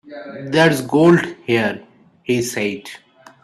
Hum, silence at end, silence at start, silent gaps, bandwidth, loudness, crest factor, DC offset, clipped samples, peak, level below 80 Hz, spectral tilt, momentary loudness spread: none; 0.5 s; 0.05 s; none; 14 kHz; -17 LUFS; 18 dB; under 0.1%; under 0.1%; 0 dBFS; -58 dBFS; -5.5 dB/octave; 20 LU